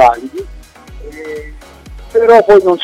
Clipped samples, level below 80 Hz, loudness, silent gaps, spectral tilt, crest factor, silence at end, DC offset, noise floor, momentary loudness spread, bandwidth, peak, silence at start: under 0.1%; -34 dBFS; -9 LUFS; none; -5.5 dB/octave; 12 dB; 0 s; under 0.1%; -33 dBFS; 25 LU; 13.5 kHz; 0 dBFS; 0 s